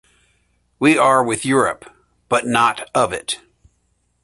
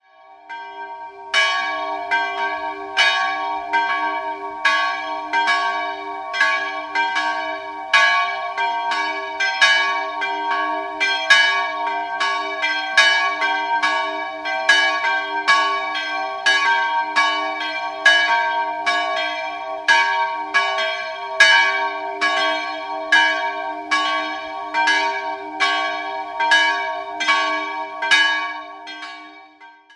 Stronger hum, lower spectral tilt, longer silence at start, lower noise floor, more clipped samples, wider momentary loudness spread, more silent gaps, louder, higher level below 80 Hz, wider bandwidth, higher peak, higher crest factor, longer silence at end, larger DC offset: first, 60 Hz at -60 dBFS vs none; first, -4 dB/octave vs 1 dB/octave; first, 0.8 s vs 0.3 s; first, -65 dBFS vs -46 dBFS; neither; about the same, 12 LU vs 12 LU; neither; about the same, -17 LUFS vs -18 LUFS; first, -54 dBFS vs -68 dBFS; about the same, 11.5 kHz vs 11.5 kHz; about the same, -2 dBFS vs 0 dBFS; about the same, 18 dB vs 20 dB; first, 0.85 s vs 0.25 s; neither